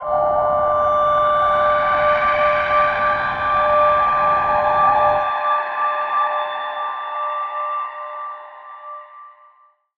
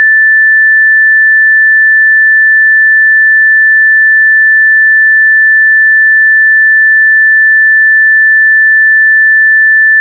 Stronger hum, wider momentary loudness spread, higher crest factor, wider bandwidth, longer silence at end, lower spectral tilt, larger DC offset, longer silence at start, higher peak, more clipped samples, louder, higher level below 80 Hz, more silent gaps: neither; first, 14 LU vs 0 LU; first, 14 dB vs 4 dB; first, 6.2 kHz vs 2 kHz; first, 0.7 s vs 0 s; first, -5.5 dB/octave vs 21.5 dB/octave; neither; about the same, 0 s vs 0 s; about the same, -4 dBFS vs -2 dBFS; neither; second, -17 LUFS vs -3 LUFS; first, -48 dBFS vs under -90 dBFS; neither